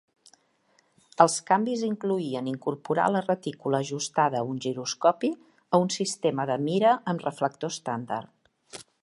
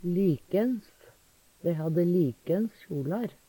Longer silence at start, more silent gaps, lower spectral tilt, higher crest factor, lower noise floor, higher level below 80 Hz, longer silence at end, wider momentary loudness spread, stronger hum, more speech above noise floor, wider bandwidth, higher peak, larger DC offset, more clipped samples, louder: first, 1.2 s vs 0 s; neither; second, -4.5 dB/octave vs -9.5 dB/octave; first, 24 dB vs 14 dB; first, -67 dBFS vs -62 dBFS; second, -76 dBFS vs -64 dBFS; about the same, 0.2 s vs 0.2 s; about the same, 10 LU vs 8 LU; neither; first, 41 dB vs 34 dB; second, 11.5 kHz vs 18 kHz; first, -2 dBFS vs -16 dBFS; neither; neither; about the same, -27 LUFS vs -29 LUFS